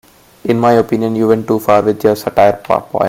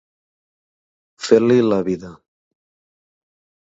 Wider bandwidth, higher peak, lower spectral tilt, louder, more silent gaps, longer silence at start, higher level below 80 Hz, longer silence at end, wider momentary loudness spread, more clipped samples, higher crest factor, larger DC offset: first, 16.5 kHz vs 8 kHz; about the same, 0 dBFS vs 0 dBFS; about the same, -7 dB/octave vs -6.5 dB/octave; first, -13 LUFS vs -17 LUFS; neither; second, 0.45 s vs 1.2 s; first, -50 dBFS vs -60 dBFS; second, 0 s vs 1.5 s; second, 5 LU vs 14 LU; neither; second, 12 dB vs 22 dB; neither